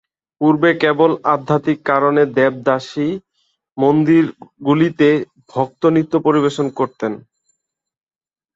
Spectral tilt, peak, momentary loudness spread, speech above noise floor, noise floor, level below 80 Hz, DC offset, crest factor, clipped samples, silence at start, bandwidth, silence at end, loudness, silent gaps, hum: -7.5 dB/octave; -2 dBFS; 9 LU; 61 dB; -76 dBFS; -60 dBFS; under 0.1%; 16 dB; under 0.1%; 0.4 s; 7.8 kHz; 1.35 s; -16 LUFS; none; none